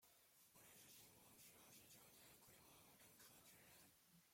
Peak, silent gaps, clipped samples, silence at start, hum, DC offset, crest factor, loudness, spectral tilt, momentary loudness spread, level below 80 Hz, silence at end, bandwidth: -54 dBFS; none; under 0.1%; 0 s; none; under 0.1%; 16 dB; -66 LUFS; -2 dB/octave; 3 LU; under -90 dBFS; 0 s; 16.5 kHz